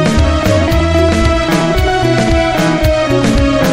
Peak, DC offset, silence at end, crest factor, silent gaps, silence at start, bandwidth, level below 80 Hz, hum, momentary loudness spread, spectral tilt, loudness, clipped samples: 0 dBFS; under 0.1%; 0 s; 10 dB; none; 0 s; 16.5 kHz; -18 dBFS; none; 1 LU; -6 dB/octave; -12 LUFS; under 0.1%